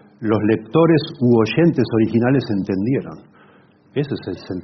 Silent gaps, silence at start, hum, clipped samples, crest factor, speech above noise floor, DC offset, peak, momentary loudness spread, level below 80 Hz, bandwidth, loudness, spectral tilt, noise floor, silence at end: none; 0.2 s; none; under 0.1%; 16 dB; 33 dB; under 0.1%; -4 dBFS; 11 LU; -54 dBFS; 6.2 kHz; -18 LUFS; -7 dB/octave; -51 dBFS; 0 s